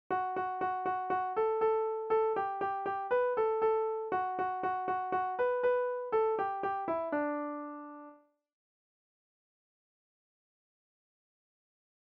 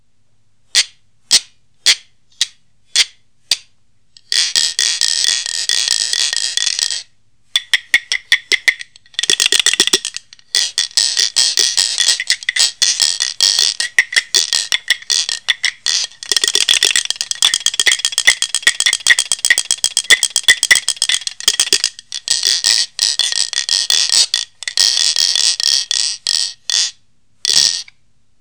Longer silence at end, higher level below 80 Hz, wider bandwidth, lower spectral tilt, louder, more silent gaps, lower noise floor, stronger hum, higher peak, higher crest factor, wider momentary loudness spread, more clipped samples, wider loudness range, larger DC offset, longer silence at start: first, 3.95 s vs 0.6 s; second, -74 dBFS vs -60 dBFS; second, 5 kHz vs 11 kHz; first, -3.5 dB/octave vs 3.5 dB/octave; second, -33 LUFS vs -13 LUFS; neither; second, -58 dBFS vs -63 dBFS; neither; second, -20 dBFS vs 0 dBFS; about the same, 14 dB vs 16 dB; about the same, 5 LU vs 7 LU; second, under 0.1% vs 0.4%; first, 9 LU vs 4 LU; second, under 0.1% vs 0.4%; second, 0.1 s vs 0.75 s